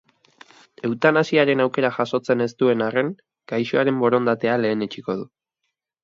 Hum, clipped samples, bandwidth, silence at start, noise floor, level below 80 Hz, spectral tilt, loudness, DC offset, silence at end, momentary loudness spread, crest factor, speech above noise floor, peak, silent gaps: none; under 0.1%; 7.6 kHz; 0.85 s; -79 dBFS; -70 dBFS; -6.5 dB/octave; -21 LUFS; under 0.1%; 0.75 s; 11 LU; 20 dB; 58 dB; -2 dBFS; none